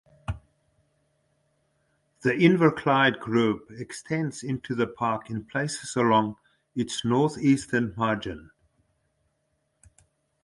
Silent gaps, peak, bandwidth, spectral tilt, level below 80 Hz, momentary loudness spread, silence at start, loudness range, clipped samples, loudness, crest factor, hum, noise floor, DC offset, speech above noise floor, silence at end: none; -6 dBFS; 11.5 kHz; -5.5 dB/octave; -54 dBFS; 16 LU; 0.3 s; 4 LU; under 0.1%; -25 LUFS; 22 dB; none; -74 dBFS; under 0.1%; 49 dB; 2 s